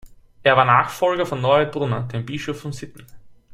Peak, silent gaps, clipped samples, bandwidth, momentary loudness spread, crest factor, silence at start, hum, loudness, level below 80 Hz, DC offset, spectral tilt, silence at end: -2 dBFS; none; under 0.1%; 15 kHz; 16 LU; 20 dB; 0.05 s; none; -20 LUFS; -52 dBFS; under 0.1%; -5.5 dB/octave; 0.2 s